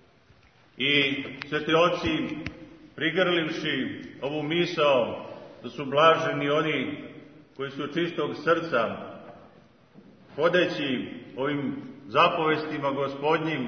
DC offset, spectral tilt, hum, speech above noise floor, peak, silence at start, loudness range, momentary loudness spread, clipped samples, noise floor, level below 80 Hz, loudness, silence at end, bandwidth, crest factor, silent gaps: under 0.1%; -5.5 dB/octave; none; 33 dB; -6 dBFS; 0.8 s; 4 LU; 17 LU; under 0.1%; -58 dBFS; -62 dBFS; -26 LUFS; 0 s; 6.6 kHz; 20 dB; none